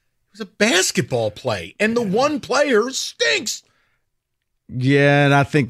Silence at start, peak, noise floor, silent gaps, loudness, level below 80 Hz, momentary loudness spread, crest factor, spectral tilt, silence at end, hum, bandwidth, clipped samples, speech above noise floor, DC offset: 0.4 s; -2 dBFS; -74 dBFS; none; -18 LUFS; -58 dBFS; 12 LU; 16 dB; -4.5 dB/octave; 0 s; none; 15 kHz; under 0.1%; 55 dB; under 0.1%